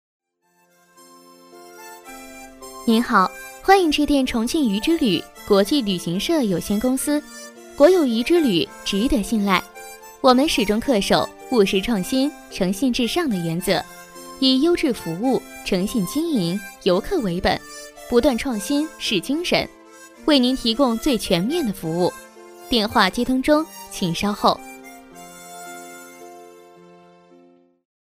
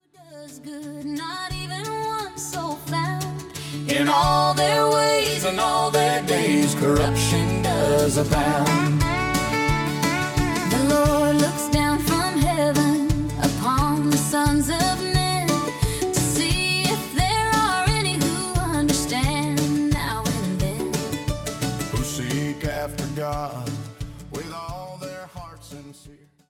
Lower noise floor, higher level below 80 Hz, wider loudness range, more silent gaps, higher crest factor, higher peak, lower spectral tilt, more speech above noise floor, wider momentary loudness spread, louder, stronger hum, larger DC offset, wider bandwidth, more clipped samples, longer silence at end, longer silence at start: first, -63 dBFS vs -49 dBFS; second, -44 dBFS vs -36 dBFS; second, 5 LU vs 9 LU; neither; about the same, 18 dB vs 16 dB; first, -2 dBFS vs -6 dBFS; about the same, -4.5 dB/octave vs -4.5 dB/octave; first, 44 dB vs 29 dB; first, 21 LU vs 14 LU; about the same, -20 LUFS vs -22 LUFS; neither; neither; second, 15.5 kHz vs 18 kHz; neither; first, 1.6 s vs 0.4 s; first, 1.55 s vs 0.2 s